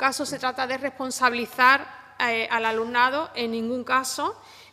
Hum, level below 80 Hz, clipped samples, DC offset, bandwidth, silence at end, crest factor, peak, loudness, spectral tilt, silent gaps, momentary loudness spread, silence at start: none; -68 dBFS; under 0.1%; under 0.1%; 15.5 kHz; 0.1 s; 20 dB; -4 dBFS; -24 LUFS; -2 dB/octave; none; 10 LU; 0 s